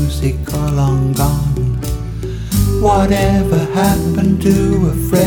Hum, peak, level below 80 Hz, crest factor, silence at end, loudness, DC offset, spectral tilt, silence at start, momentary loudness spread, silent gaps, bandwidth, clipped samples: none; 0 dBFS; -22 dBFS; 14 dB; 0 s; -15 LUFS; under 0.1%; -6.5 dB/octave; 0 s; 7 LU; none; over 20 kHz; under 0.1%